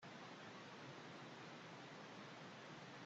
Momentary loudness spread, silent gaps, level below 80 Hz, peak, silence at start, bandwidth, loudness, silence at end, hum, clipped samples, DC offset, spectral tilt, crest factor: 0 LU; none; under -90 dBFS; -44 dBFS; 0 s; 8.2 kHz; -56 LUFS; 0 s; none; under 0.1%; under 0.1%; -4.5 dB/octave; 14 dB